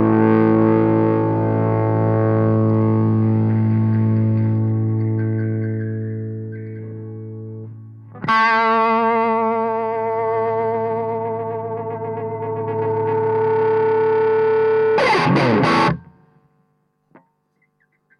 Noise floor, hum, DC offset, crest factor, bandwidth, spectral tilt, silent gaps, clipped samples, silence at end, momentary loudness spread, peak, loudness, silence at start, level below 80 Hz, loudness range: -66 dBFS; none; under 0.1%; 14 dB; 6.8 kHz; -8.5 dB/octave; none; under 0.1%; 2.15 s; 14 LU; -4 dBFS; -18 LUFS; 0 s; -54 dBFS; 6 LU